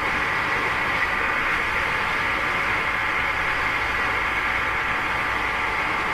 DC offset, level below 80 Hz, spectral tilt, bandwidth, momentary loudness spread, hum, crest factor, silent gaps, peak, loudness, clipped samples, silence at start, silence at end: under 0.1%; -42 dBFS; -3.5 dB/octave; 14 kHz; 1 LU; none; 12 dB; none; -10 dBFS; -22 LUFS; under 0.1%; 0 s; 0 s